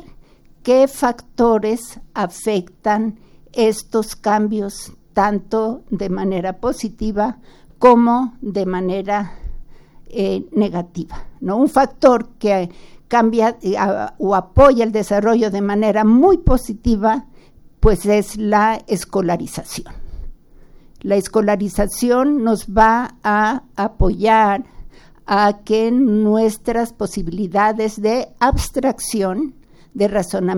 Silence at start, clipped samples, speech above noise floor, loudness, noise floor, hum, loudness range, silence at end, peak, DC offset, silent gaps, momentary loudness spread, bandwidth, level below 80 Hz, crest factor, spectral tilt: 0.65 s; under 0.1%; 29 dB; -17 LUFS; -45 dBFS; none; 5 LU; 0 s; 0 dBFS; under 0.1%; none; 11 LU; 17 kHz; -30 dBFS; 16 dB; -6 dB/octave